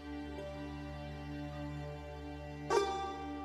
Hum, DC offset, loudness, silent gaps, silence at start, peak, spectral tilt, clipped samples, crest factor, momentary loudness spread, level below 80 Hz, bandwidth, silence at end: none; under 0.1%; -41 LUFS; none; 0 s; -18 dBFS; -5.5 dB/octave; under 0.1%; 22 dB; 12 LU; -52 dBFS; 14.5 kHz; 0 s